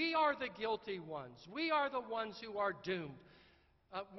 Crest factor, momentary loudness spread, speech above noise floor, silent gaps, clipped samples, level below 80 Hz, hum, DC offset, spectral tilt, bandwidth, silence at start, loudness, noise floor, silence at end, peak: 18 dB; 14 LU; 29 dB; none; under 0.1%; -74 dBFS; none; under 0.1%; -2 dB/octave; 6 kHz; 0 s; -39 LUFS; -69 dBFS; 0 s; -22 dBFS